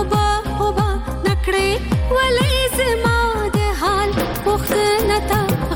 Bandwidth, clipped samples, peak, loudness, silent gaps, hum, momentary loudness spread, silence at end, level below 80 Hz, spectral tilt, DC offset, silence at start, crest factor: 19.5 kHz; under 0.1%; -6 dBFS; -18 LUFS; none; none; 4 LU; 0 s; -26 dBFS; -5 dB/octave; under 0.1%; 0 s; 12 dB